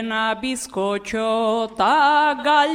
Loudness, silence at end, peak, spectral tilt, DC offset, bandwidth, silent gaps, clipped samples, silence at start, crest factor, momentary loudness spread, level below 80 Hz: -19 LUFS; 0 s; -6 dBFS; -3 dB/octave; under 0.1%; 15.5 kHz; none; under 0.1%; 0 s; 14 dB; 9 LU; -56 dBFS